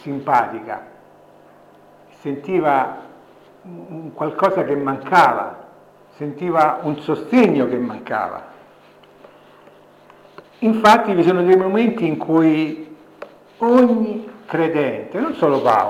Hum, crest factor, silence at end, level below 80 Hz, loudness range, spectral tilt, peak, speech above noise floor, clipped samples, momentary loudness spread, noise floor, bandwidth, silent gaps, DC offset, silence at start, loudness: 50 Hz at -55 dBFS; 16 dB; 0 s; -64 dBFS; 8 LU; -7 dB/octave; -4 dBFS; 31 dB; under 0.1%; 19 LU; -48 dBFS; 16 kHz; none; under 0.1%; 0.05 s; -17 LUFS